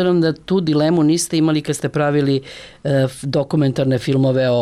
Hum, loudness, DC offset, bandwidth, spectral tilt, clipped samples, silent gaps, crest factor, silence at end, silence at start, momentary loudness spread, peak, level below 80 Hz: none; -17 LUFS; under 0.1%; 14 kHz; -6 dB/octave; under 0.1%; none; 10 dB; 0 s; 0 s; 6 LU; -8 dBFS; -52 dBFS